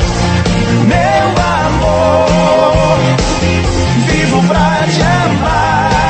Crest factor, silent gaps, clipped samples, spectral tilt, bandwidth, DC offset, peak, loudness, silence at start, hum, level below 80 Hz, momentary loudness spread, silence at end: 10 dB; none; 0.1%; -5.5 dB/octave; 8.8 kHz; under 0.1%; 0 dBFS; -11 LUFS; 0 s; none; -22 dBFS; 3 LU; 0 s